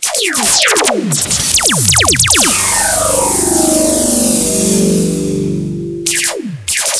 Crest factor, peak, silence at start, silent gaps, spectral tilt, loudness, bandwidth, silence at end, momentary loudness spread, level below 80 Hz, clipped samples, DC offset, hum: 12 dB; 0 dBFS; 0 s; none; -2.5 dB/octave; -10 LUFS; 11 kHz; 0 s; 9 LU; -34 dBFS; under 0.1%; under 0.1%; none